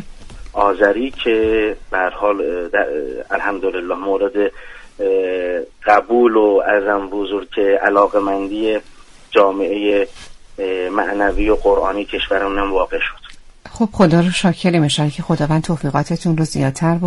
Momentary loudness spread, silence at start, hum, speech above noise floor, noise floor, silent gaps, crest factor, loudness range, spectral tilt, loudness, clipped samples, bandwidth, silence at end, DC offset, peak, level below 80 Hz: 8 LU; 0 s; none; 21 dB; -37 dBFS; none; 16 dB; 4 LU; -6 dB/octave; -17 LUFS; under 0.1%; 11.5 kHz; 0 s; under 0.1%; 0 dBFS; -36 dBFS